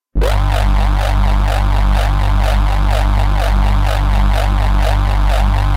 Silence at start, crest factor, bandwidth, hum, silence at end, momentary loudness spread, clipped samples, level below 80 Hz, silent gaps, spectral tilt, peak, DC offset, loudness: 0.15 s; 6 dB; 13 kHz; 50 Hz at -25 dBFS; 0 s; 1 LU; under 0.1%; -12 dBFS; none; -6 dB/octave; -6 dBFS; under 0.1%; -15 LUFS